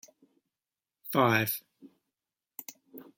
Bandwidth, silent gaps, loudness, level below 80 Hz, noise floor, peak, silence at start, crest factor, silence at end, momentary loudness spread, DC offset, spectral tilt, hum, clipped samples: 17 kHz; none; -28 LUFS; -74 dBFS; under -90 dBFS; -10 dBFS; 1.05 s; 24 dB; 0.15 s; 23 LU; under 0.1%; -5 dB/octave; none; under 0.1%